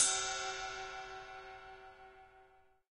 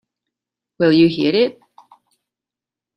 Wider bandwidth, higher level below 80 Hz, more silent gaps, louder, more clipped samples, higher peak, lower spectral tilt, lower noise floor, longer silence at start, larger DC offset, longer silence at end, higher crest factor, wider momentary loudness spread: first, 10.5 kHz vs 5.8 kHz; about the same, -66 dBFS vs -62 dBFS; neither; second, -39 LUFS vs -16 LUFS; neither; second, -16 dBFS vs -2 dBFS; second, 1 dB/octave vs -8 dB/octave; second, -66 dBFS vs -88 dBFS; second, 0 s vs 0.8 s; neither; second, 0.5 s vs 1.45 s; first, 24 dB vs 18 dB; first, 22 LU vs 6 LU